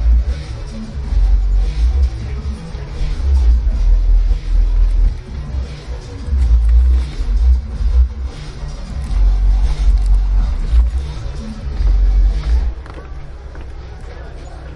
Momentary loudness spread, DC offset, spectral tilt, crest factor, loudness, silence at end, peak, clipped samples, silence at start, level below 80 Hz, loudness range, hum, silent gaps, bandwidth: 17 LU; under 0.1%; -7 dB/octave; 12 dB; -18 LUFS; 0 s; -2 dBFS; under 0.1%; 0 s; -14 dBFS; 2 LU; none; none; 6.4 kHz